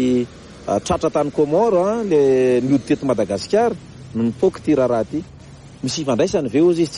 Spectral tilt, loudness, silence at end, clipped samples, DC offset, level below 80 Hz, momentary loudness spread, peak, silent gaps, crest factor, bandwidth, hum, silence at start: -6 dB/octave; -18 LUFS; 0 s; under 0.1%; under 0.1%; -48 dBFS; 12 LU; -4 dBFS; none; 14 dB; 11 kHz; none; 0 s